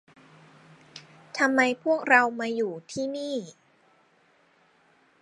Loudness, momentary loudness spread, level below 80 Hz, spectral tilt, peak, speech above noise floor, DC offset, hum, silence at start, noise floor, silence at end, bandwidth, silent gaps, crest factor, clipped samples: -25 LUFS; 27 LU; -80 dBFS; -4 dB/octave; -4 dBFS; 38 dB; under 0.1%; none; 0.95 s; -63 dBFS; 1.7 s; 11.5 kHz; none; 24 dB; under 0.1%